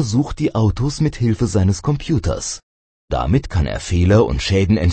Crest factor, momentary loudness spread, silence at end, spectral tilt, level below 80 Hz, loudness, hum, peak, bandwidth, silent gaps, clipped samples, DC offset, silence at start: 16 dB; 8 LU; 0 s; -6.5 dB/octave; -28 dBFS; -18 LUFS; none; 0 dBFS; 8.8 kHz; 2.63-3.08 s; under 0.1%; under 0.1%; 0 s